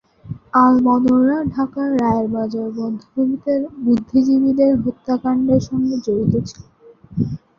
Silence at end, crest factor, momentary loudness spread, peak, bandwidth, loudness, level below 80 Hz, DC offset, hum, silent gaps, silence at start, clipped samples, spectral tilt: 0.2 s; 16 dB; 10 LU; 0 dBFS; 7 kHz; -18 LUFS; -46 dBFS; under 0.1%; none; none; 0.25 s; under 0.1%; -8.5 dB/octave